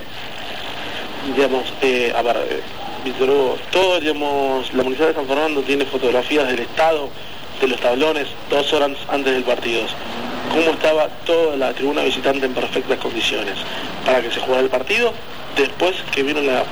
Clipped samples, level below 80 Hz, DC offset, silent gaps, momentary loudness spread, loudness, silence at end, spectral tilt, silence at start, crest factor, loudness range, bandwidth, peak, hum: under 0.1%; -50 dBFS; 3%; none; 10 LU; -19 LUFS; 0 s; -3.5 dB/octave; 0 s; 14 dB; 1 LU; over 20 kHz; -4 dBFS; none